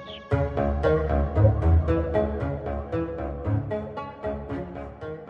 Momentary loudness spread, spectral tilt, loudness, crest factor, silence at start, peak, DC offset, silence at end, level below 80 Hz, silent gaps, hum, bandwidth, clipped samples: 12 LU; -10 dB/octave; -26 LUFS; 18 dB; 0 s; -8 dBFS; under 0.1%; 0 s; -34 dBFS; none; none; 5.2 kHz; under 0.1%